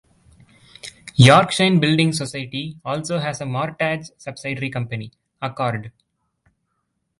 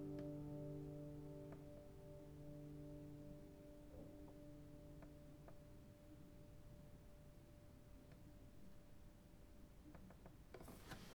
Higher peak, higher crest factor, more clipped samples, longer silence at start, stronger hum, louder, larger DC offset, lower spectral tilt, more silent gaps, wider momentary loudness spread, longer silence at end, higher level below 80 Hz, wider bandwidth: first, 0 dBFS vs -42 dBFS; first, 22 dB vs 16 dB; neither; first, 0.85 s vs 0 s; neither; first, -19 LUFS vs -59 LUFS; neither; second, -5.5 dB/octave vs -7 dB/octave; neither; first, 18 LU vs 13 LU; first, 1.3 s vs 0 s; first, -52 dBFS vs -66 dBFS; second, 11.5 kHz vs over 20 kHz